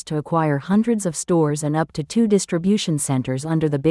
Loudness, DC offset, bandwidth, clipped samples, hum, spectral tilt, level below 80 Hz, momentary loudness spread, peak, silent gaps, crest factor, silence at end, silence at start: -20 LUFS; under 0.1%; 12 kHz; under 0.1%; none; -6 dB/octave; -54 dBFS; 4 LU; -6 dBFS; none; 14 dB; 0 s; 0.05 s